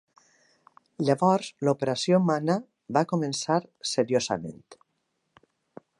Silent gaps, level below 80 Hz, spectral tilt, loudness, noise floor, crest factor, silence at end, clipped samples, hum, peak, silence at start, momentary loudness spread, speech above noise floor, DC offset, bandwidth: none; -70 dBFS; -5.5 dB/octave; -26 LUFS; -77 dBFS; 20 dB; 1.25 s; under 0.1%; none; -8 dBFS; 1 s; 7 LU; 51 dB; under 0.1%; 11.5 kHz